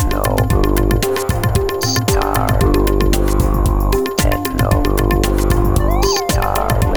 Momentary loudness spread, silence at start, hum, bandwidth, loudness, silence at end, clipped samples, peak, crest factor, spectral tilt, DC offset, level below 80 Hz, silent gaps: 2 LU; 0 s; none; over 20 kHz; -16 LUFS; 0 s; under 0.1%; -2 dBFS; 12 dB; -5.5 dB/octave; under 0.1%; -18 dBFS; none